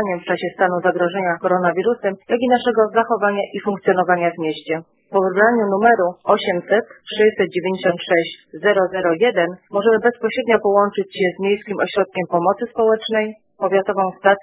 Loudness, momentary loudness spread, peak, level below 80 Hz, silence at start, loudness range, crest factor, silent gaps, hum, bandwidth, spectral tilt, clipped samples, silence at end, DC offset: -18 LUFS; 7 LU; 0 dBFS; -62 dBFS; 0 s; 1 LU; 18 dB; none; none; 4 kHz; -9.5 dB/octave; under 0.1%; 0 s; under 0.1%